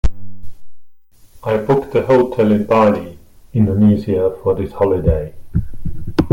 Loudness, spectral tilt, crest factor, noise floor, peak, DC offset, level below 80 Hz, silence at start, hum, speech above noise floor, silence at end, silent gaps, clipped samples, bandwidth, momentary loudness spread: -16 LUFS; -9 dB/octave; 14 dB; -45 dBFS; -2 dBFS; under 0.1%; -30 dBFS; 0.05 s; none; 30 dB; 0 s; none; under 0.1%; 15.5 kHz; 11 LU